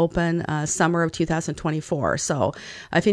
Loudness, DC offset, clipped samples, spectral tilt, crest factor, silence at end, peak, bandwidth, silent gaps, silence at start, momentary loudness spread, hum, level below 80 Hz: -23 LUFS; under 0.1%; under 0.1%; -5 dB/octave; 18 dB; 0 s; -4 dBFS; 11 kHz; none; 0 s; 5 LU; none; -46 dBFS